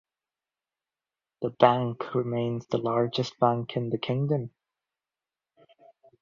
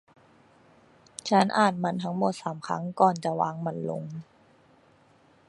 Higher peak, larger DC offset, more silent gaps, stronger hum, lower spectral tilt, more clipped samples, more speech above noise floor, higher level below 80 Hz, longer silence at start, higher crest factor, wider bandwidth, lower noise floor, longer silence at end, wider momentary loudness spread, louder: about the same, -4 dBFS vs -6 dBFS; neither; neither; neither; first, -7.5 dB/octave vs -5.5 dB/octave; neither; first, over 64 dB vs 34 dB; about the same, -68 dBFS vs -72 dBFS; first, 1.4 s vs 1.25 s; about the same, 26 dB vs 22 dB; second, 7.4 kHz vs 11.5 kHz; first, under -90 dBFS vs -60 dBFS; first, 1.75 s vs 1.25 s; second, 9 LU vs 14 LU; about the same, -27 LUFS vs -27 LUFS